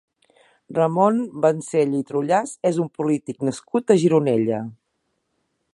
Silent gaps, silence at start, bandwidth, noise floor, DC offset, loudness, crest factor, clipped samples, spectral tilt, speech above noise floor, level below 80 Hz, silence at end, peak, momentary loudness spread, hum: none; 0.7 s; 11.5 kHz; -73 dBFS; under 0.1%; -21 LUFS; 18 dB; under 0.1%; -7 dB/octave; 53 dB; -70 dBFS; 1 s; -2 dBFS; 9 LU; none